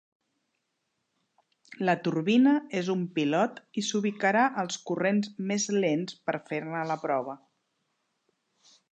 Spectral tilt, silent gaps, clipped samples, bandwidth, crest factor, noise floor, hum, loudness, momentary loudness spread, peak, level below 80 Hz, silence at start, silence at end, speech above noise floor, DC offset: -5 dB/octave; none; under 0.1%; 8.8 kHz; 18 dB; -80 dBFS; none; -28 LUFS; 9 LU; -12 dBFS; -82 dBFS; 1.7 s; 1.55 s; 52 dB; under 0.1%